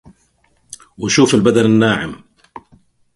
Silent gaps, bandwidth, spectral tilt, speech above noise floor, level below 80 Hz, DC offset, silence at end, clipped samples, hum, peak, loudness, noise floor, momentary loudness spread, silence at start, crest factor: none; 11.5 kHz; -5 dB/octave; 46 dB; -50 dBFS; under 0.1%; 1 s; under 0.1%; none; 0 dBFS; -13 LUFS; -59 dBFS; 21 LU; 1 s; 16 dB